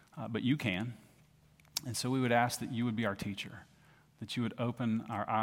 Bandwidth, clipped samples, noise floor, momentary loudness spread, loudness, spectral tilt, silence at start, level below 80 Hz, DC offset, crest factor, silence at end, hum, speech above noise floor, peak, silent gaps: 16.5 kHz; under 0.1%; -64 dBFS; 13 LU; -35 LUFS; -5 dB/octave; 0.15 s; -70 dBFS; under 0.1%; 20 dB; 0 s; none; 30 dB; -14 dBFS; none